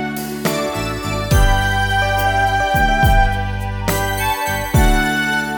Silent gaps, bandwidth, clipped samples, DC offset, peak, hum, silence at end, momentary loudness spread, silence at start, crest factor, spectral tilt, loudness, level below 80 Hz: none; over 20 kHz; under 0.1%; 0.3%; -2 dBFS; none; 0 s; 7 LU; 0 s; 14 dB; -4.5 dB/octave; -17 LUFS; -22 dBFS